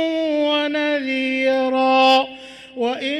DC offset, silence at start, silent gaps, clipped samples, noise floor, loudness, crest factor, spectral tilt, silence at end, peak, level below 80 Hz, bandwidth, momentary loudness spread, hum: under 0.1%; 0 s; none; under 0.1%; -38 dBFS; -18 LUFS; 14 dB; -3 dB/octave; 0 s; -6 dBFS; -64 dBFS; 11 kHz; 12 LU; none